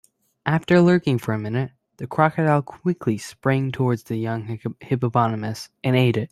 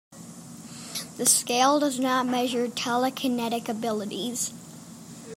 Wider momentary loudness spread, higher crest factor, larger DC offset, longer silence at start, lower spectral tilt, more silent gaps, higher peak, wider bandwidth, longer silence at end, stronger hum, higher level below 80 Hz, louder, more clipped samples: second, 11 LU vs 22 LU; about the same, 20 dB vs 20 dB; neither; first, 0.45 s vs 0.1 s; first, -7.5 dB/octave vs -2.5 dB/octave; neither; first, -2 dBFS vs -6 dBFS; second, 13 kHz vs 16 kHz; about the same, 0.05 s vs 0 s; neither; first, -58 dBFS vs -74 dBFS; first, -22 LUFS vs -25 LUFS; neither